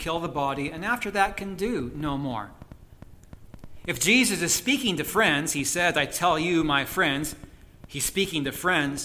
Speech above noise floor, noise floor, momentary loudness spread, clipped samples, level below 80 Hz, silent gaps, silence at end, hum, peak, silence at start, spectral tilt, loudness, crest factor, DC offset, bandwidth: 22 dB; -48 dBFS; 11 LU; under 0.1%; -48 dBFS; none; 0 s; none; -6 dBFS; 0 s; -3 dB/octave; -25 LUFS; 20 dB; under 0.1%; 16 kHz